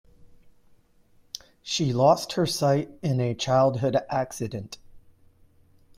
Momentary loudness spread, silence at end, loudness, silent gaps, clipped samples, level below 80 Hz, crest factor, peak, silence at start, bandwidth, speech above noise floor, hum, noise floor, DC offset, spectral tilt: 19 LU; 1 s; -25 LUFS; none; under 0.1%; -58 dBFS; 20 dB; -8 dBFS; 0.25 s; 16 kHz; 35 dB; none; -59 dBFS; under 0.1%; -5.5 dB/octave